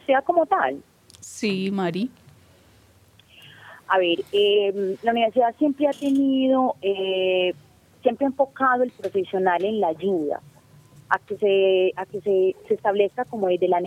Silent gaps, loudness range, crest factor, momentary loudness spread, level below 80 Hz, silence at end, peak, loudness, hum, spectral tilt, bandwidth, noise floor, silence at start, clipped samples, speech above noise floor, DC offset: none; 5 LU; 18 dB; 7 LU; -68 dBFS; 0 s; -4 dBFS; -22 LUFS; none; -5.5 dB/octave; 12 kHz; -55 dBFS; 0.1 s; under 0.1%; 33 dB; under 0.1%